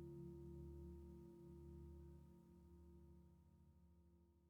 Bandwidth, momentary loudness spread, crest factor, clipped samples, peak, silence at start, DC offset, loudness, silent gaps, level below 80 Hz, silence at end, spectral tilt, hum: 16 kHz; 10 LU; 14 dB; under 0.1%; -46 dBFS; 0 s; under 0.1%; -61 LUFS; none; -66 dBFS; 0 s; -9.5 dB/octave; none